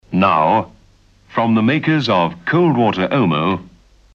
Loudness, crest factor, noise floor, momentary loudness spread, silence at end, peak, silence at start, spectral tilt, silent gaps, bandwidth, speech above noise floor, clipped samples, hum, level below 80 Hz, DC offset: -16 LUFS; 16 dB; -51 dBFS; 7 LU; 0.45 s; -2 dBFS; 0.1 s; -8 dB/octave; none; 7.2 kHz; 35 dB; under 0.1%; none; -52 dBFS; under 0.1%